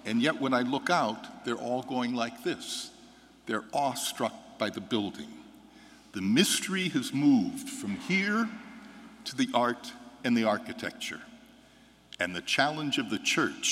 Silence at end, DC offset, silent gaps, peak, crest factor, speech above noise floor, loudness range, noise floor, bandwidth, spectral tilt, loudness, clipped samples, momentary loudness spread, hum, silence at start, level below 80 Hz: 0 s; under 0.1%; none; -10 dBFS; 22 dB; 29 dB; 5 LU; -58 dBFS; 16 kHz; -3.5 dB/octave; -30 LUFS; under 0.1%; 17 LU; none; 0.05 s; -72 dBFS